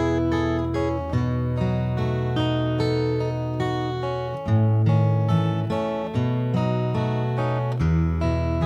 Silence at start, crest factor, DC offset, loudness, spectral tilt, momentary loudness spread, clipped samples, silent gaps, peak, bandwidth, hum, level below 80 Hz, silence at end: 0 s; 14 dB; under 0.1%; -24 LUFS; -8.5 dB/octave; 5 LU; under 0.1%; none; -8 dBFS; 7.8 kHz; none; -38 dBFS; 0 s